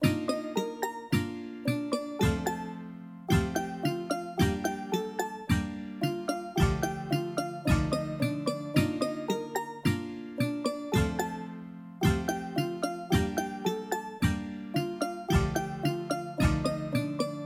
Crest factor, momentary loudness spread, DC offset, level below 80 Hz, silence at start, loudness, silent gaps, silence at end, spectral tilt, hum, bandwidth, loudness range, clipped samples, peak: 20 dB; 7 LU; under 0.1%; -42 dBFS; 0 s; -31 LUFS; none; 0 s; -6 dB/octave; none; 16.5 kHz; 2 LU; under 0.1%; -12 dBFS